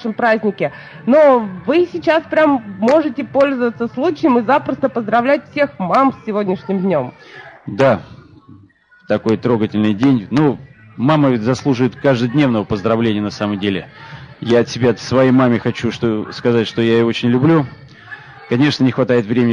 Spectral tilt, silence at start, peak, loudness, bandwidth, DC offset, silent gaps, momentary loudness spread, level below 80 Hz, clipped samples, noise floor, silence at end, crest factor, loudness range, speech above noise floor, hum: -7 dB/octave; 0 s; -2 dBFS; -15 LUFS; 9.8 kHz; under 0.1%; none; 8 LU; -54 dBFS; under 0.1%; -48 dBFS; 0 s; 14 dB; 4 LU; 33 dB; none